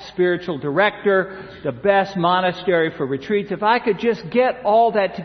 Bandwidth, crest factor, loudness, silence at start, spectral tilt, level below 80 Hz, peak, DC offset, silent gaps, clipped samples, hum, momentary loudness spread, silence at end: 6.4 kHz; 16 dB; -19 LUFS; 0 s; -7 dB/octave; -56 dBFS; -2 dBFS; under 0.1%; none; under 0.1%; none; 6 LU; 0 s